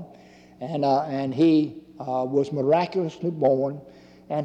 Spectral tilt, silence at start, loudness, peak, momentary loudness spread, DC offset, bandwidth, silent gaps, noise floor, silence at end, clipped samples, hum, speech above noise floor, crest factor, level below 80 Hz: -8 dB/octave; 0 s; -24 LUFS; -10 dBFS; 12 LU; under 0.1%; 8 kHz; none; -50 dBFS; 0 s; under 0.1%; none; 27 dB; 14 dB; -66 dBFS